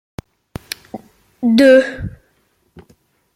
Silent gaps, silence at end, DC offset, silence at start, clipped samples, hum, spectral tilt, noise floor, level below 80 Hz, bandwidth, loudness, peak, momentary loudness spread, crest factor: none; 1.25 s; under 0.1%; 0.95 s; under 0.1%; none; -5.5 dB/octave; -61 dBFS; -44 dBFS; 16 kHz; -12 LUFS; -2 dBFS; 27 LU; 16 dB